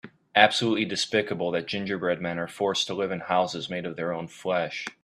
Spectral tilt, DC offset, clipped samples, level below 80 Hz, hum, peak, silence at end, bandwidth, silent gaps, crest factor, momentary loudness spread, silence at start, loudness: -4 dB/octave; under 0.1%; under 0.1%; -68 dBFS; none; -2 dBFS; 0.1 s; 13.5 kHz; none; 26 dB; 11 LU; 0.05 s; -26 LUFS